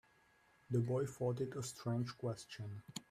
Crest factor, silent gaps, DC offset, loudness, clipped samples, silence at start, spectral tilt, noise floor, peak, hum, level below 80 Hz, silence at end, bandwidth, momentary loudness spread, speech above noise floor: 16 dB; none; under 0.1%; -42 LUFS; under 0.1%; 0.7 s; -6.5 dB/octave; -72 dBFS; -26 dBFS; none; -74 dBFS; 0.1 s; 14.5 kHz; 11 LU; 31 dB